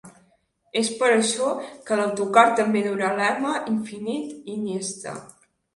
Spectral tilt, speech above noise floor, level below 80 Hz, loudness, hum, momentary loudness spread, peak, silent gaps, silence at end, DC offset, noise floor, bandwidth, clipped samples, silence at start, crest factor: -3.5 dB/octave; 42 dB; -70 dBFS; -23 LUFS; none; 14 LU; -2 dBFS; none; 0.5 s; under 0.1%; -64 dBFS; 11.5 kHz; under 0.1%; 0.05 s; 22 dB